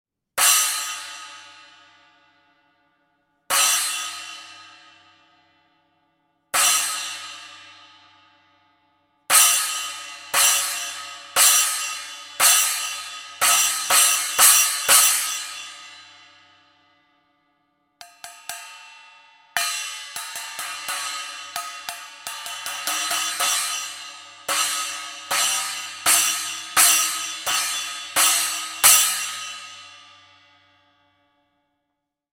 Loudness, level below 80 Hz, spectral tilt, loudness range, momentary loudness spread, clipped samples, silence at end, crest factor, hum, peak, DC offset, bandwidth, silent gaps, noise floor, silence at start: -19 LUFS; -72 dBFS; 3 dB/octave; 13 LU; 21 LU; under 0.1%; 2.3 s; 24 dB; none; 0 dBFS; under 0.1%; 17 kHz; none; -80 dBFS; 0.35 s